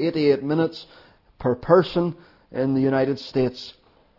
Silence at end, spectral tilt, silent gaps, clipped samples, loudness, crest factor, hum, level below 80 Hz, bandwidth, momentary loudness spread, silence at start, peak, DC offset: 0.45 s; -8 dB/octave; none; under 0.1%; -22 LUFS; 20 dB; none; -54 dBFS; 6 kHz; 18 LU; 0 s; -2 dBFS; under 0.1%